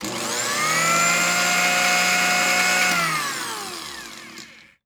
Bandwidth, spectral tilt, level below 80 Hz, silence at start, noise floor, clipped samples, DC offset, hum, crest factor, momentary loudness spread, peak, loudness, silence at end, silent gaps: over 20 kHz; -1 dB/octave; -64 dBFS; 0 s; -43 dBFS; under 0.1%; under 0.1%; none; 14 dB; 16 LU; -6 dBFS; -18 LUFS; 0.35 s; none